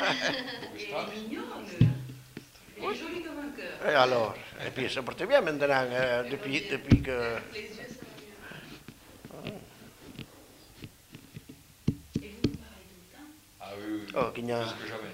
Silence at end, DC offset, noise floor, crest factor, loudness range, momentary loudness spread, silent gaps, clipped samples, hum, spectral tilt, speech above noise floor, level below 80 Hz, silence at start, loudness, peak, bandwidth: 0 s; under 0.1%; -54 dBFS; 26 dB; 17 LU; 23 LU; none; under 0.1%; none; -6 dB/octave; 24 dB; -50 dBFS; 0 s; -31 LUFS; -8 dBFS; 16 kHz